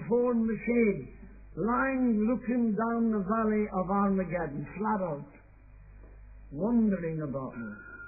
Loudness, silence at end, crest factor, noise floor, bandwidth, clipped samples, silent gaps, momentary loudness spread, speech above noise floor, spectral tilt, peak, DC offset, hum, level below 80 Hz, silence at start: -29 LUFS; 0 s; 14 dB; -53 dBFS; 2.6 kHz; under 0.1%; none; 13 LU; 24 dB; -14 dB/octave; -16 dBFS; under 0.1%; none; -52 dBFS; 0 s